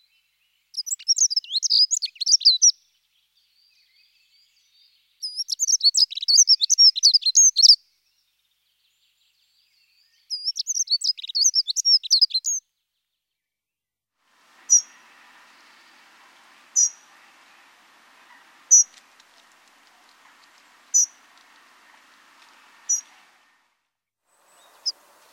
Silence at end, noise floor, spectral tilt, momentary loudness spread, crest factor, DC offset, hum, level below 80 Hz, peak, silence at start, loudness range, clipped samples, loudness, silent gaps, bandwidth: 0.4 s; -88 dBFS; 7.5 dB/octave; 16 LU; 22 dB; under 0.1%; 50 Hz at -90 dBFS; under -90 dBFS; -2 dBFS; 0.75 s; 13 LU; under 0.1%; -17 LUFS; none; 16 kHz